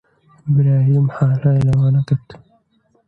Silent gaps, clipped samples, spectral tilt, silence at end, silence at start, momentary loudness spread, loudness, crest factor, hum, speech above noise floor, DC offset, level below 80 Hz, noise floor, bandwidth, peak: none; under 0.1%; -10.5 dB/octave; 0.75 s; 0.45 s; 7 LU; -16 LUFS; 12 dB; none; 46 dB; under 0.1%; -46 dBFS; -60 dBFS; 4.4 kHz; -4 dBFS